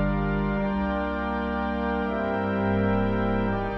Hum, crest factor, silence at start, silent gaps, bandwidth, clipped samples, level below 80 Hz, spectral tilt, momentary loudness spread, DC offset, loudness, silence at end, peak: none; 12 dB; 0 s; none; 5.8 kHz; under 0.1%; -36 dBFS; -9.5 dB/octave; 4 LU; under 0.1%; -26 LUFS; 0 s; -14 dBFS